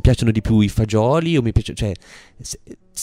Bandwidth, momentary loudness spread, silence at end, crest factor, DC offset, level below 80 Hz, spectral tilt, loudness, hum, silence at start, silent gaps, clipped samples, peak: 13.5 kHz; 17 LU; 0 s; 16 dB; under 0.1%; -30 dBFS; -6.5 dB/octave; -18 LUFS; none; 0.05 s; none; under 0.1%; -4 dBFS